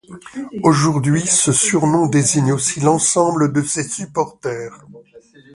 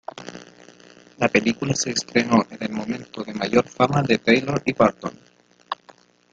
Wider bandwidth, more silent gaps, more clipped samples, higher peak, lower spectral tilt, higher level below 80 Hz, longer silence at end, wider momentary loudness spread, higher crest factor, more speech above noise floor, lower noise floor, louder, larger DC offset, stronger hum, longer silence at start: first, 11.5 kHz vs 9.4 kHz; neither; neither; about the same, 0 dBFS vs -2 dBFS; about the same, -4.5 dB/octave vs -4.5 dB/octave; about the same, -54 dBFS vs -58 dBFS; second, 0.35 s vs 0.6 s; about the same, 13 LU vs 15 LU; about the same, 18 dB vs 22 dB; about the same, 29 dB vs 32 dB; second, -46 dBFS vs -53 dBFS; first, -16 LUFS vs -21 LUFS; neither; neither; about the same, 0.1 s vs 0.2 s